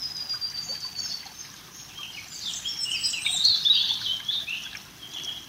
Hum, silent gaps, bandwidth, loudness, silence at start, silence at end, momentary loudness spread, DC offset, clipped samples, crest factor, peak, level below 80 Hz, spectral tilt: none; none; 16 kHz; -25 LUFS; 0 s; 0 s; 20 LU; under 0.1%; under 0.1%; 20 dB; -8 dBFS; -64 dBFS; 1 dB/octave